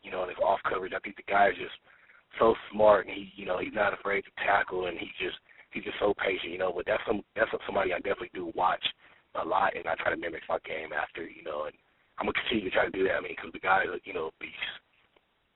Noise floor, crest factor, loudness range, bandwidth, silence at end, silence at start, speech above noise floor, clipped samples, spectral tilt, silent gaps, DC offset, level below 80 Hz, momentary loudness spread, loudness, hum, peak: -69 dBFS; 22 dB; 4 LU; 4 kHz; 0.75 s; 0.05 s; 39 dB; under 0.1%; -1.5 dB/octave; none; under 0.1%; -60 dBFS; 12 LU; -30 LUFS; none; -8 dBFS